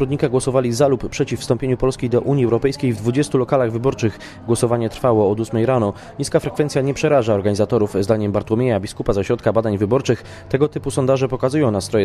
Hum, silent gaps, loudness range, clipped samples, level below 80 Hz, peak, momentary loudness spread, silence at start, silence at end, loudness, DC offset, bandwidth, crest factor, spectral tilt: none; none; 1 LU; under 0.1%; -42 dBFS; -2 dBFS; 5 LU; 0 s; 0 s; -19 LUFS; under 0.1%; 13.5 kHz; 16 dB; -6.5 dB/octave